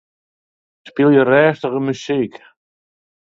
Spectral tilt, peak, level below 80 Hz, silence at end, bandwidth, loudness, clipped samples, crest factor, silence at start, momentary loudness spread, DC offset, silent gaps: -7 dB/octave; 0 dBFS; -62 dBFS; 1 s; 7.6 kHz; -16 LUFS; under 0.1%; 18 dB; 0.85 s; 12 LU; under 0.1%; none